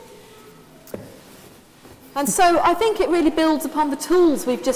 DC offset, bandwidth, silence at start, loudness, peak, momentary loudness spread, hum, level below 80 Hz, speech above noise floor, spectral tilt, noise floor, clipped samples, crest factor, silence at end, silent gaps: under 0.1%; 16 kHz; 0 s; -19 LUFS; -4 dBFS; 21 LU; none; -50 dBFS; 28 dB; -3.5 dB/octave; -46 dBFS; under 0.1%; 16 dB; 0 s; none